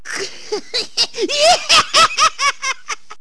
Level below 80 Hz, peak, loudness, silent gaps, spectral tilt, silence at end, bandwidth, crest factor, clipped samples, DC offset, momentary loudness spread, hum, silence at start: -50 dBFS; -2 dBFS; -14 LUFS; none; 0.5 dB/octave; 0.05 s; 11 kHz; 16 dB; under 0.1%; 2%; 15 LU; none; 0.05 s